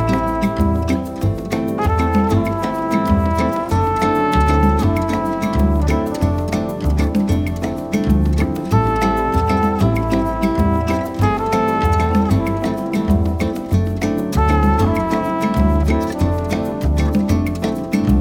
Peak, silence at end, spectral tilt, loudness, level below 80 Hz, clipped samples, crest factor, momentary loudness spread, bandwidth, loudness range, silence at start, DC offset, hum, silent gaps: -2 dBFS; 0 s; -7.5 dB/octave; -18 LUFS; -24 dBFS; under 0.1%; 14 dB; 5 LU; 16.5 kHz; 2 LU; 0 s; under 0.1%; none; none